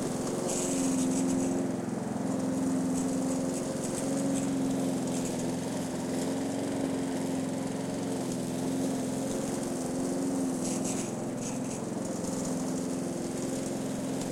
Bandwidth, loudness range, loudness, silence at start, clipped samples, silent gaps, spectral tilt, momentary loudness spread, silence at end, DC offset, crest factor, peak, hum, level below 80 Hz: 16.5 kHz; 2 LU; -32 LUFS; 0 s; under 0.1%; none; -5 dB/octave; 5 LU; 0 s; under 0.1%; 16 dB; -16 dBFS; none; -60 dBFS